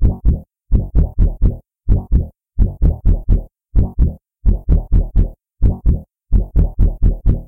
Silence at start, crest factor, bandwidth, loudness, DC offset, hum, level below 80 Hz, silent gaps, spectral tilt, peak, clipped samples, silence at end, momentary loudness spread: 0 s; 8 dB; 1.6 kHz; -19 LUFS; under 0.1%; none; -16 dBFS; none; -12.5 dB/octave; -6 dBFS; under 0.1%; 0 s; 4 LU